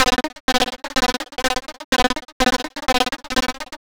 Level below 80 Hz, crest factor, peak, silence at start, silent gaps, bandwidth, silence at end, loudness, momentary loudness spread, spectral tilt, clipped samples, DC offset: -36 dBFS; 18 dB; -4 dBFS; 0 s; 0.40-0.48 s, 1.84-1.92 s, 2.32-2.40 s; over 20 kHz; 0.1 s; -21 LUFS; 4 LU; -2 dB/octave; under 0.1%; under 0.1%